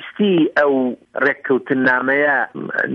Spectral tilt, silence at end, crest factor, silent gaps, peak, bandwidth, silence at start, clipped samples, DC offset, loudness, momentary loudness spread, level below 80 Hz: -7.5 dB/octave; 0 s; 14 dB; none; -4 dBFS; 6.2 kHz; 0 s; under 0.1%; under 0.1%; -17 LUFS; 6 LU; -64 dBFS